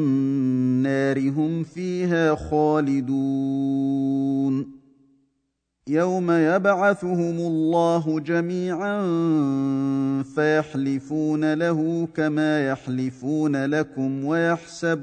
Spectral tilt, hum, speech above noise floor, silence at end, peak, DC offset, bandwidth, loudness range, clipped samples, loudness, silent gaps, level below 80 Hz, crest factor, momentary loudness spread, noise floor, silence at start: -7.5 dB/octave; none; 53 dB; 0 s; -6 dBFS; under 0.1%; 9.2 kHz; 2 LU; under 0.1%; -23 LUFS; none; -56 dBFS; 16 dB; 5 LU; -75 dBFS; 0 s